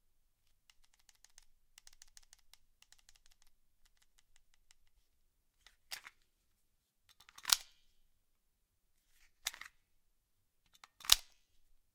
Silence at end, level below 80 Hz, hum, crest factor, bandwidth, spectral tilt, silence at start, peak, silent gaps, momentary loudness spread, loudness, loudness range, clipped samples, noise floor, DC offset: 0.75 s; -66 dBFS; none; 44 dB; 17 kHz; 3 dB/octave; 5.9 s; -2 dBFS; none; 20 LU; -35 LUFS; 19 LU; under 0.1%; -80 dBFS; under 0.1%